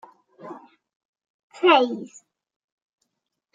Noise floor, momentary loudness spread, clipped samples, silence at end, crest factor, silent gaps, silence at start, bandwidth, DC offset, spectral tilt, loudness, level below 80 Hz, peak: -81 dBFS; 24 LU; under 0.1%; 1.5 s; 24 dB; 0.96-1.13 s, 1.30-1.50 s; 0.45 s; 7.8 kHz; under 0.1%; -4 dB/octave; -19 LUFS; -90 dBFS; -4 dBFS